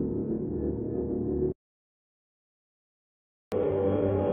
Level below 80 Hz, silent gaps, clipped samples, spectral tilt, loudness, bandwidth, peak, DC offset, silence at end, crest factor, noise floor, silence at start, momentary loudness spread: -48 dBFS; 1.55-3.51 s; under 0.1%; -10 dB/octave; -30 LUFS; 4.9 kHz; -14 dBFS; under 0.1%; 0 s; 16 dB; under -90 dBFS; 0 s; 6 LU